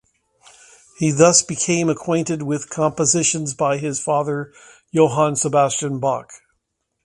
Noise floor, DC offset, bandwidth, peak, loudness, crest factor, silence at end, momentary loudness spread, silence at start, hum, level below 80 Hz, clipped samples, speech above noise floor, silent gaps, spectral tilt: -74 dBFS; under 0.1%; 11.5 kHz; 0 dBFS; -18 LUFS; 20 dB; 0.7 s; 10 LU; 1 s; none; -58 dBFS; under 0.1%; 55 dB; none; -4 dB/octave